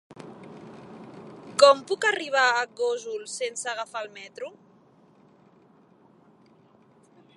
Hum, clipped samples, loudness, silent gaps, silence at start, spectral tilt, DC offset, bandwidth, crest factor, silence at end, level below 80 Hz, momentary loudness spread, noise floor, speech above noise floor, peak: none; under 0.1%; -24 LUFS; none; 0.1 s; -1.5 dB/octave; under 0.1%; 11.5 kHz; 26 dB; 2.85 s; -80 dBFS; 27 LU; -58 dBFS; 32 dB; -2 dBFS